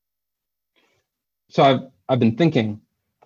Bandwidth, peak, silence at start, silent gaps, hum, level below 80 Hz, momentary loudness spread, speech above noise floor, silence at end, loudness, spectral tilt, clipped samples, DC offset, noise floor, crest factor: 7.2 kHz; -4 dBFS; 1.55 s; none; none; -62 dBFS; 10 LU; 65 dB; 0.5 s; -20 LUFS; -7.5 dB/octave; under 0.1%; under 0.1%; -83 dBFS; 18 dB